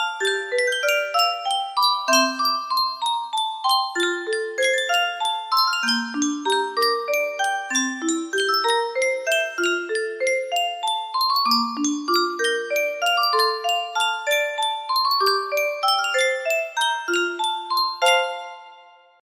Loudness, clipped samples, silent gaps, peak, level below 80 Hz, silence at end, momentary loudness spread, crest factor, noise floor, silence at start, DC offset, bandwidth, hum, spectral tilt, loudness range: -21 LUFS; under 0.1%; none; -4 dBFS; -74 dBFS; 0.55 s; 5 LU; 18 dB; -49 dBFS; 0 s; under 0.1%; 15.5 kHz; none; 0 dB/octave; 1 LU